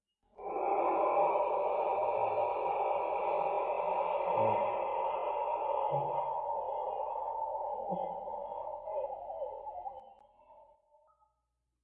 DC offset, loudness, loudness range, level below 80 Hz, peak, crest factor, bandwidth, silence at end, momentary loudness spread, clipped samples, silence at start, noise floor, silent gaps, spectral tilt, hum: under 0.1%; -34 LUFS; 10 LU; -70 dBFS; -18 dBFS; 16 dB; 4.4 kHz; 1.2 s; 11 LU; under 0.1%; 0.4 s; -83 dBFS; none; -8.5 dB/octave; none